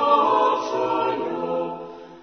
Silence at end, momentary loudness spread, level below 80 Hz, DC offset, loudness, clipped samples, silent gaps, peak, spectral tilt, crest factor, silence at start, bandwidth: 0 s; 15 LU; -66 dBFS; under 0.1%; -22 LUFS; under 0.1%; none; -6 dBFS; -5 dB/octave; 16 dB; 0 s; 6.6 kHz